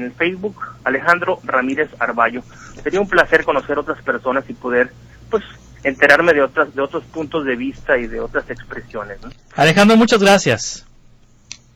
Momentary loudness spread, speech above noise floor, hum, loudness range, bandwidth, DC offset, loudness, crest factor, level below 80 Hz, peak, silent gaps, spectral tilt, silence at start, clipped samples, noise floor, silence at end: 18 LU; 31 dB; none; 3 LU; 16.5 kHz; under 0.1%; -16 LUFS; 18 dB; -42 dBFS; 0 dBFS; none; -4.5 dB/octave; 0 s; under 0.1%; -48 dBFS; 0.95 s